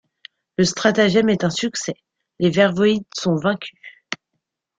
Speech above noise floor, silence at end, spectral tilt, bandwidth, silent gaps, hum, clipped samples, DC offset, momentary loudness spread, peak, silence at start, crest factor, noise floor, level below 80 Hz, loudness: 59 dB; 0.65 s; -5 dB/octave; 9.4 kHz; none; none; under 0.1%; under 0.1%; 16 LU; -2 dBFS; 0.6 s; 18 dB; -77 dBFS; -58 dBFS; -19 LUFS